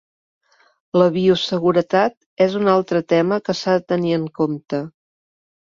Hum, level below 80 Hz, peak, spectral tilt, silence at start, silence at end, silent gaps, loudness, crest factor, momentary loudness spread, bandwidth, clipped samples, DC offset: none; -60 dBFS; -4 dBFS; -6.5 dB/octave; 0.95 s; 0.8 s; 2.17-2.37 s; -19 LUFS; 16 dB; 7 LU; 7.4 kHz; under 0.1%; under 0.1%